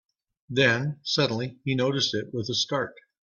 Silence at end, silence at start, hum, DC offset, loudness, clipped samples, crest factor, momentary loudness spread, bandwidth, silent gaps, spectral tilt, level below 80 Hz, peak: 0.3 s; 0.5 s; none; under 0.1%; -26 LUFS; under 0.1%; 20 dB; 8 LU; 7.4 kHz; none; -4.5 dB/octave; -64 dBFS; -8 dBFS